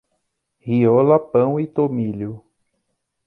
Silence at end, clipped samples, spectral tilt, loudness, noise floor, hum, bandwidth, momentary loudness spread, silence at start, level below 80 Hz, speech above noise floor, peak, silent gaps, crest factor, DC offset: 0.9 s; under 0.1%; -11.5 dB/octave; -18 LUFS; -74 dBFS; none; 4.1 kHz; 15 LU; 0.65 s; -60 dBFS; 56 dB; -2 dBFS; none; 18 dB; under 0.1%